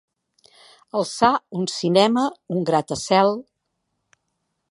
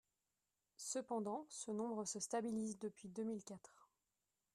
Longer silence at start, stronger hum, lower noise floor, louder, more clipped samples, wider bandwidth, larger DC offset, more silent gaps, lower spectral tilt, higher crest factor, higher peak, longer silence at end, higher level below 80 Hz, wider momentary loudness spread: first, 0.95 s vs 0.8 s; neither; second, -76 dBFS vs under -90 dBFS; first, -21 LUFS vs -46 LUFS; neither; second, 11.5 kHz vs 13.5 kHz; neither; neither; about the same, -5 dB/octave vs -4 dB/octave; about the same, 20 dB vs 16 dB; first, -2 dBFS vs -30 dBFS; first, 1.3 s vs 0.7 s; first, -62 dBFS vs -88 dBFS; about the same, 9 LU vs 8 LU